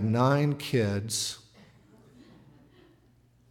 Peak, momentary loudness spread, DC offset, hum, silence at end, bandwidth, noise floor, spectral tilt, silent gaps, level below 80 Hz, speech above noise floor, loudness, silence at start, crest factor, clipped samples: -12 dBFS; 9 LU; under 0.1%; none; 2.15 s; 17 kHz; -62 dBFS; -5 dB/octave; none; -68 dBFS; 36 dB; -27 LUFS; 0 s; 18 dB; under 0.1%